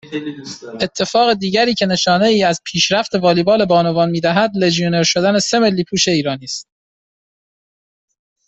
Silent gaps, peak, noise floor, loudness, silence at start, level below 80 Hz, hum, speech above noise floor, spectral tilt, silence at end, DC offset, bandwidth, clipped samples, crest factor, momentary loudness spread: none; -2 dBFS; under -90 dBFS; -15 LUFS; 0.05 s; -54 dBFS; none; over 75 dB; -4 dB/octave; 1.85 s; under 0.1%; 8.4 kHz; under 0.1%; 14 dB; 12 LU